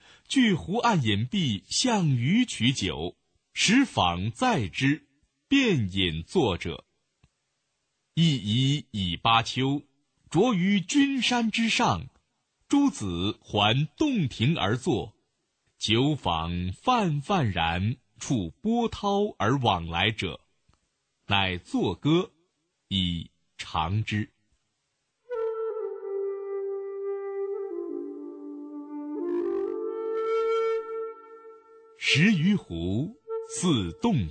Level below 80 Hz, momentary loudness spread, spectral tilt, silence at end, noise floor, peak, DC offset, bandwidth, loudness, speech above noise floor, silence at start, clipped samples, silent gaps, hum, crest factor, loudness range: -52 dBFS; 12 LU; -5 dB/octave; 0 s; -78 dBFS; -8 dBFS; under 0.1%; 9.2 kHz; -26 LUFS; 53 dB; 0.3 s; under 0.1%; none; none; 20 dB; 8 LU